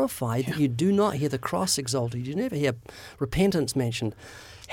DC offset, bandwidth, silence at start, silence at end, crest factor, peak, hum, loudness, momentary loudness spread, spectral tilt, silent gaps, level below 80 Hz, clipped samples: under 0.1%; 17 kHz; 0 s; 0 s; 16 dB; -10 dBFS; none; -26 LUFS; 14 LU; -5 dB/octave; none; -48 dBFS; under 0.1%